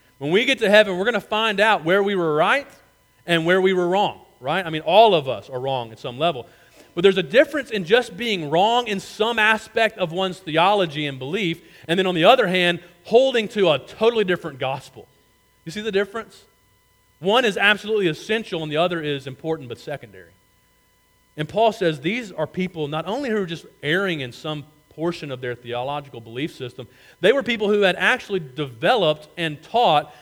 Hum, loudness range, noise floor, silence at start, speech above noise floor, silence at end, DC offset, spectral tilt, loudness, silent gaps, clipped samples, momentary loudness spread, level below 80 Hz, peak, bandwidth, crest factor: none; 7 LU; -60 dBFS; 0.2 s; 39 dB; 0.1 s; under 0.1%; -5 dB/octave; -20 LUFS; none; under 0.1%; 13 LU; -62 dBFS; 0 dBFS; 17 kHz; 22 dB